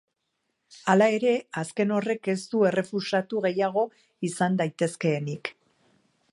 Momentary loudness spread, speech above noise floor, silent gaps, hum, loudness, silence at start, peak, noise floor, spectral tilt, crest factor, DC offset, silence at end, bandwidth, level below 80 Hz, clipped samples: 11 LU; 53 dB; none; none; -26 LUFS; 0.7 s; -6 dBFS; -78 dBFS; -6 dB/octave; 20 dB; under 0.1%; 0.8 s; 11.5 kHz; -76 dBFS; under 0.1%